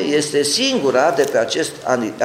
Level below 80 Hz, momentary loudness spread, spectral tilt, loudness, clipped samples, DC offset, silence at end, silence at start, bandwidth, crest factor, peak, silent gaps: -60 dBFS; 5 LU; -3 dB/octave; -17 LUFS; under 0.1%; under 0.1%; 0 s; 0 s; 16.5 kHz; 16 dB; 0 dBFS; none